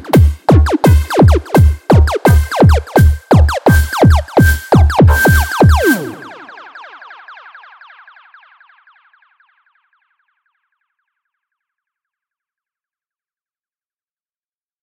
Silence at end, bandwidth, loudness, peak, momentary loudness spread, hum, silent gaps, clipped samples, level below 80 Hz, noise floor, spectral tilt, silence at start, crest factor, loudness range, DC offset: 7.5 s; 17 kHz; -10 LUFS; 0 dBFS; 3 LU; none; none; under 0.1%; -18 dBFS; under -90 dBFS; -7 dB/octave; 0.05 s; 12 dB; 7 LU; under 0.1%